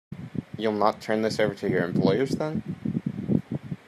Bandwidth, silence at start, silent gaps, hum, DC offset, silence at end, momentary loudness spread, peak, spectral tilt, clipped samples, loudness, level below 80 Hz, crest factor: 13 kHz; 0.1 s; none; none; under 0.1%; 0.1 s; 10 LU; -6 dBFS; -7 dB/octave; under 0.1%; -27 LUFS; -60 dBFS; 20 dB